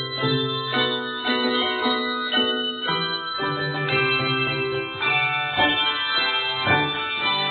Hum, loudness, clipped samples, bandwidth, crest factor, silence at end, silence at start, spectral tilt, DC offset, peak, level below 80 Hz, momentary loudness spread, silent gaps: none; -22 LUFS; under 0.1%; 4.7 kHz; 16 dB; 0 s; 0 s; -8 dB/octave; under 0.1%; -6 dBFS; -60 dBFS; 5 LU; none